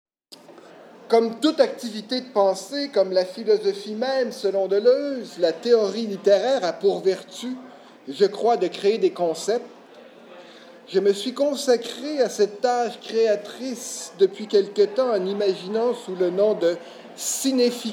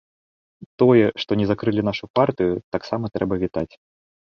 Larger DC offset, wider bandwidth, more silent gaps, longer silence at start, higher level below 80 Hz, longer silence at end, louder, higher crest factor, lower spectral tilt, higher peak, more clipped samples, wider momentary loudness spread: neither; first, 17 kHz vs 6.6 kHz; second, none vs 2.10-2.14 s, 2.64-2.72 s; second, 0.3 s vs 0.8 s; second, -90 dBFS vs -50 dBFS; second, 0 s vs 0.6 s; about the same, -23 LUFS vs -21 LUFS; about the same, 18 dB vs 18 dB; second, -4 dB/octave vs -8 dB/octave; about the same, -4 dBFS vs -4 dBFS; neither; about the same, 10 LU vs 11 LU